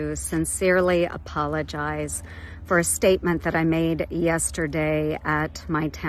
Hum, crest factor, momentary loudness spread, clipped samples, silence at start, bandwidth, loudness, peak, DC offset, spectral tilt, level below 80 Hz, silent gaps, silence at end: none; 16 dB; 8 LU; under 0.1%; 0 s; 14 kHz; -24 LUFS; -8 dBFS; under 0.1%; -5 dB/octave; -42 dBFS; none; 0 s